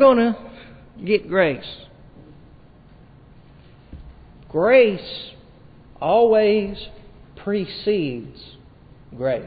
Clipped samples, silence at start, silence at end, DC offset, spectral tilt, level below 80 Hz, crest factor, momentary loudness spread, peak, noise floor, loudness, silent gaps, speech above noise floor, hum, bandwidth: under 0.1%; 0 s; 0 s; under 0.1%; -10.5 dB/octave; -50 dBFS; 18 dB; 23 LU; -2 dBFS; -48 dBFS; -20 LUFS; none; 29 dB; none; 5 kHz